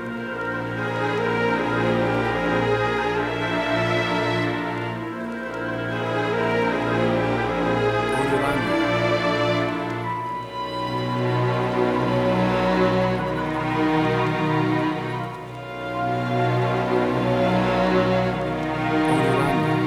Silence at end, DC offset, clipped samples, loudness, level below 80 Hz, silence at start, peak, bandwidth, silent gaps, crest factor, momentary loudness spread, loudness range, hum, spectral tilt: 0 s; under 0.1%; under 0.1%; -22 LUFS; -46 dBFS; 0 s; -8 dBFS; 13.5 kHz; none; 16 dB; 8 LU; 3 LU; none; -6.5 dB/octave